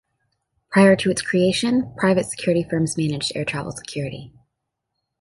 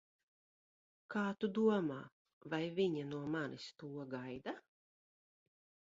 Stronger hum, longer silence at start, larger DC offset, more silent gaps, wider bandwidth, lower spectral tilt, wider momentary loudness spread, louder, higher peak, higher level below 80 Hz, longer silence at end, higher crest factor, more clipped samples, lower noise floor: neither; second, 0.7 s vs 1.1 s; neither; second, none vs 2.12-2.25 s, 2.33-2.41 s; first, 11.5 kHz vs 7.6 kHz; about the same, -5 dB/octave vs -5 dB/octave; about the same, 14 LU vs 15 LU; first, -20 LUFS vs -40 LUFS; first, -2 dBFS vs -22 dBFS; first, -54 dBFS vs -82 dBFS; second, 0.9 s vs 1.35 s; about the same, 18 dB vs 20 dB; neither; second, -79 dBFS vs under -90 dBFS